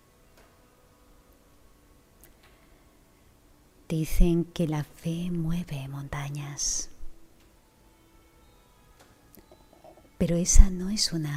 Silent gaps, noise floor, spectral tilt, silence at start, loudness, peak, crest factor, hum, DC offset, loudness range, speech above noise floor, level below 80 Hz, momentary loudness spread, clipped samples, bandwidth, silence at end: none; -59 dBFS; -4.5 dB/octave; 3.9 s; -28 LUFS; 0 dBFS; 28 dB; none; under 0.1%; 7 LU; 36 dB; -30 dBFS; 13 LU; under 0.1%; 15 kHz; 0 s